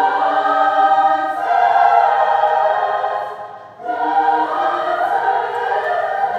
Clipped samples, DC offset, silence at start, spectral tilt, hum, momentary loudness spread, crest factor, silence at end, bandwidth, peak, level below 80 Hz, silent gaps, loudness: under 0.1%; under 0.1%; 0 s; -4 dB/octave; none; 9 LU; 16 dB; 0 s; 8.2 kHz; 0 dBFS; -74 dBFS; none; -16 LUFS